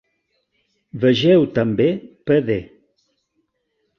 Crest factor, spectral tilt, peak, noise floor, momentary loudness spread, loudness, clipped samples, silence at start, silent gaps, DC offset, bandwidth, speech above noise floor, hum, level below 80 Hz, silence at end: 16 dB; -7.5 dB/octave; -4 dBFS; -71 dBFS; 11 LU; -18 LUFS; under 0.1%; 0.95 s; none; under 0.1%; 6.8 kHz; 54 dB; none; -54 dBFS; 1.35 s